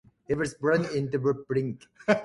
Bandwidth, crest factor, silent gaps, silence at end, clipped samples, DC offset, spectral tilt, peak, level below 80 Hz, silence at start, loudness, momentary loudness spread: 11.5 kHz; 20 dB; none; 0 s; under 0.1%; under 0.1%; -6.5 dB/octave; -8 dBFS; -60 dBFS; 0.3 s; -28 LUFS; 7 LU